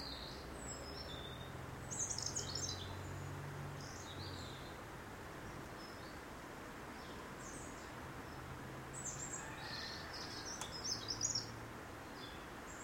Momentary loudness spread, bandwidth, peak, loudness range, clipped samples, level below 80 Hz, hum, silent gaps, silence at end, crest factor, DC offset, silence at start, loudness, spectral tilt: 10 LU; 16 kHz; -26 dBFS; 7 LU; under 0.1%; -60 dBFS; none; none; 0 s; 22 dB; under 0.1%; 0 s; -46 LUFS; -2.5 dB/octave